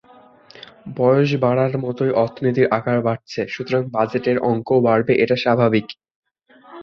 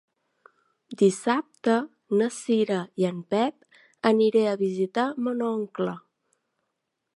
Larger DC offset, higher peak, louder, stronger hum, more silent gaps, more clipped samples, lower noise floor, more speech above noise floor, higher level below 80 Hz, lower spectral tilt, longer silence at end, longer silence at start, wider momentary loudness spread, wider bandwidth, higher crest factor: neither; first, -2 dBFS vs -6 dBFS; first, -19 LUFS vs -25 LUFS; neither; first, 6.15-6.23 s vs none; neither; second, -50 dBFS vs -81 dBFS; second, 32 dB vs 56 dB; first, -58 dBFS vs -78 dBFS; first, -8 dB/octave vs -6 dB/octave; second, 0 s vs 1.15 s; second, 0.55 s vs 0.9 s; about the same, 9 LU vs 8 LU; second, 6.8 kHz vs 11.5 kHz; about the same, 16 dB vs 20 dB